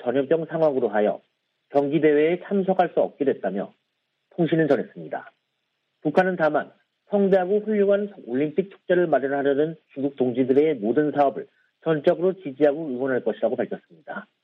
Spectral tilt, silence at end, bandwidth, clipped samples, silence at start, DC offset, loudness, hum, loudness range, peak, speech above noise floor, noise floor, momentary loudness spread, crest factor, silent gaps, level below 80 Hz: -9 dB/octave; 0.2 s; 5.6 kHz; under 0.1%; 0 s; under 0.1%; -23 LUFS; none; 3 LU; -6 dBFS; 54 dB; -76 dBFS; 12 LU; 18 dB; none; -72 dBFS